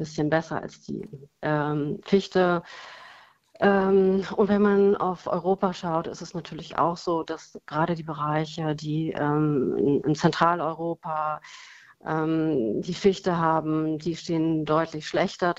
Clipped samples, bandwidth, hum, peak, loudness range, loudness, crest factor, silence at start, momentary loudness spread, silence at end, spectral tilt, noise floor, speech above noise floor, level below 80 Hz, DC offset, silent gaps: under 0.1%; 8 kHz; none; -4 dBFS; 5 LU; -25 LUFS; 22 dB; 0 s; 14 LU; 0.05 s; -7 dB/octave; -53 dBFS; 28 dB; -58 dBFS; under 0.1%; none